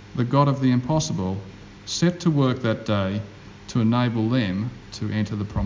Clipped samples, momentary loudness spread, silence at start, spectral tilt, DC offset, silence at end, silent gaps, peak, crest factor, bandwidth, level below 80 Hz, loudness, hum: under 0.1%; 12 LU; 0 s; -6.5 dB/octave; under 0.1%; 0 s; none; -6 dBFS; 18 dB; 7.6 kHz; -44 dBFS; -23 LUFS; none